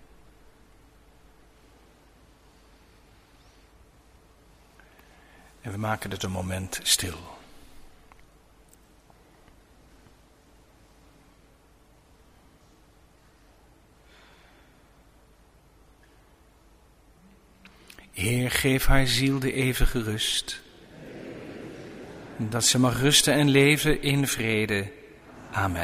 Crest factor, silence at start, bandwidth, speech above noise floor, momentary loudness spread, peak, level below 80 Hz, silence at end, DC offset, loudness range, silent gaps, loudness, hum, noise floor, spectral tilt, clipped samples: 24 dB; 5.65 s; 15.5 kHz; 34 dB; 24 LU; -4 dBFS; -40 dBFS; 0 s; under 0.1%; 14 LU; none; -24 LUFS; none; -58 dBFS; -3.5 dB/octave; under 0.1%